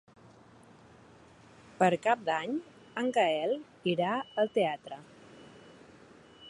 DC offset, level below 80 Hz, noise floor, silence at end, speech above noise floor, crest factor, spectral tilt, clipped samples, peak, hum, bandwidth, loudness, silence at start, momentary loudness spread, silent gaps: under 0.1%; -76 dBFS; -57 dBFS; 0 s; 27 dB; 22 dB; -5.5 dB/octave; under 0.1%; -12 dBFS; none; 11.5 kHz; -31 LUFS; 1.8 s; 19 LU; none